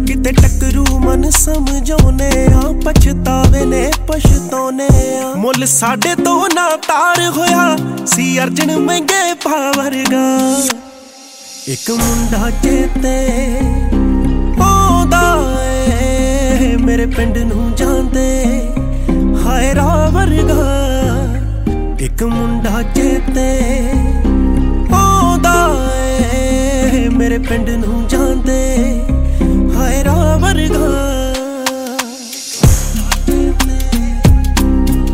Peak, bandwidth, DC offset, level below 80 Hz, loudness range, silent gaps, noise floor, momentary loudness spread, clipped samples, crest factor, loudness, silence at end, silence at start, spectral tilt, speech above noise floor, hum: 0 dBFS; 16.5 kHz; under 0.1%; -16 dBFS; 3 LU; none; -35 dBFS; 6 LU; under 0.1%; 12 dB; -13 LUFS; 0 s; 0 s; -5 dB/octave; 24 dB; none